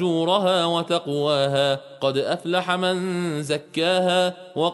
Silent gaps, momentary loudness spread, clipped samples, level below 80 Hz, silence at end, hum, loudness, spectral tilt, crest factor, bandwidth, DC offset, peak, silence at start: none; 6 LU; under 0.1%; -68 dBFS; 0 s; none; -22 LUFS; -5 dB/octave; 16 dB; 11.5 kHz; under 0.1%; -6 dBFS; 0 s